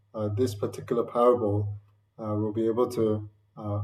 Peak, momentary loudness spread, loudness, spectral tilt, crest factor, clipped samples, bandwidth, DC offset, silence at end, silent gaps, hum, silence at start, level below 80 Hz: -10 dBFS; 15 LU; -27 LUFS; -8 dB/octave; 18 dB; under 0.1%; 15 kHz; under 0.1%; 0 s; none; none; 0.15 s; -66 dBFS